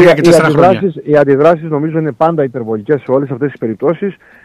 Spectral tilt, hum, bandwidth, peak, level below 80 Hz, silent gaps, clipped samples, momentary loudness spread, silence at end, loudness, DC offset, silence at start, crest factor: -7 dB/octave; none; 14 kHz; 0 dBFS; -48 dBFS; none; under 0.1%; 10 LU; 0.3 s; -12 LUFS; under 0.1%; 0 s; 10 dB